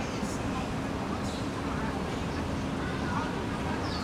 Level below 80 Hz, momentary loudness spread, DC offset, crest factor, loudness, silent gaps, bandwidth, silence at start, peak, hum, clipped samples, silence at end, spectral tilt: -44 dBFS; 2 LU; under 0.1%; 12 dB; -33 LUFS; none; 15.5 kHz; 0 s; -20 dBFS; none; under 0.1%; 0 s; -5.5 dB/octave